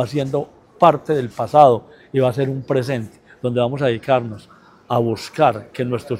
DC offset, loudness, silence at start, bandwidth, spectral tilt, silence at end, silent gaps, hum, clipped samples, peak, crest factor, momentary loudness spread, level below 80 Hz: under 0.1%; -19 LUFS; 0 s; 15.5 kHz; -7 dB/octave; 0 s; none; none; under 0.1%; 0 dBFS; 18 dB; 12 LU; -58 dBFS